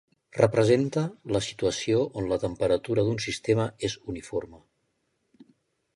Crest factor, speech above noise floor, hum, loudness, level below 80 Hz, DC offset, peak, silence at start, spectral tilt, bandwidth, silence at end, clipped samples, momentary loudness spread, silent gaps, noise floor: 22 dB; 49 dB; none; -27 LUFS; -54 dBFS; under 0.1%; -6 dBFS; 0.35 s; -5.5 dB/octave; 11.5 kHz; 1.4 s; under 0.1%; 11 LU; none; -75 dBFS